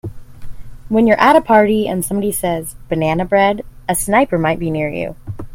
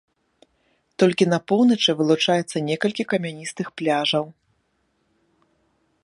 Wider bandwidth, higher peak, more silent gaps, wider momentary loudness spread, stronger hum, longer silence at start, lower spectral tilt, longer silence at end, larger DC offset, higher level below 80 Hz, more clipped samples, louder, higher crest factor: first, 16.5 kHz vs 11.5 kHz; first, 0 dBFS vs -4 dBFS; neither; about the same, 13 LU vs 13 LU; neither; second, 0.05 s vs 1 s; about the same, -5 dB/octave vs -5 dB/octave; second, 0 s vs 1.7 s; neither; first, -38 dBFS vs -70 dBFS; neither; first, -15 LUFS vs -21 LUFS; about the same, 16 dB vs 18 dB